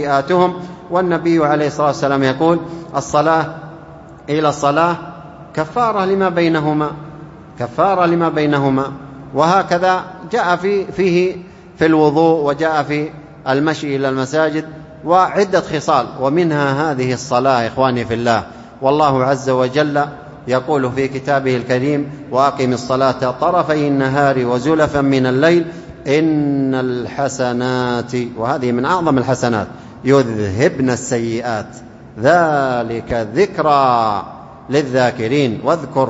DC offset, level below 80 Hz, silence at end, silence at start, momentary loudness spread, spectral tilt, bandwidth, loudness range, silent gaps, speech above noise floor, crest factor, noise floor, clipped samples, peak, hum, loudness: under 0.1%; -48 dBFS; 0 s; 0 s; 10 LU; -6 dB/octave; 8 kHz; 2 LU; none; 21 dB; 16 dB; -37 dBFS; under 0.1%; 0 dBFS; none; -16 LUFS